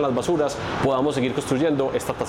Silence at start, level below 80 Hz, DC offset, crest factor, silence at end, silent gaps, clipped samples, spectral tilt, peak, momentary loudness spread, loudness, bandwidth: 0 s; -48 dBFS; under 0.1%; 12 dB; 0 s; none; under 0.1%; -5.5 dB/octave; -10 dBFS; 3 LU; -23 LUFS; 16.5 kHz